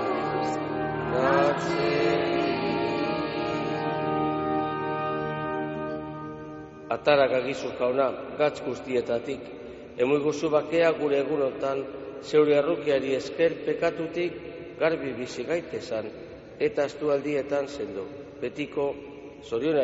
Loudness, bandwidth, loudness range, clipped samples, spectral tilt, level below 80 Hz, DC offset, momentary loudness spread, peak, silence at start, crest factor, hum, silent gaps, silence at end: -27 LUFS; 8 kHz; 5 LU; under 0.1%; -4.5 dB/octave; -58 dBFS; under 0.1%; 14 LU; -8 dBFS; 0 s; 18 dB; none; none; 0 s